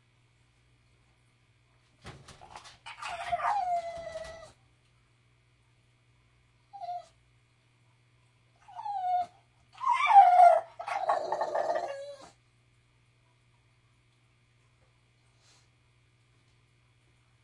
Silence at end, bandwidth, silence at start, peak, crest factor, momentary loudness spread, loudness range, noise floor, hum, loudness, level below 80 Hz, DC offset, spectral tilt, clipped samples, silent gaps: 5.3 s; 11 kHz; 2.05 s; -8 dBFS; 24 dB; 30 LU; 24 LU; -67 dBFS; 60 Hz at -70 dBFS; -27 LUFS; -70 dBFS; under 0.1%; -3 dB/octave; under 0.1%; none